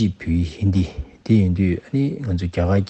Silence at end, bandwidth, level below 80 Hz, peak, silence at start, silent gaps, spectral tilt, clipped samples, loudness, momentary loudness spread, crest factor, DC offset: 0.05 s; 8.4 kHz; -40 dBFS; -4 dBFS; 0 s; none; -8.5 dB/octave; under 0.1%; -21 LUFS; 6 LU; 14 dB; under 0.1%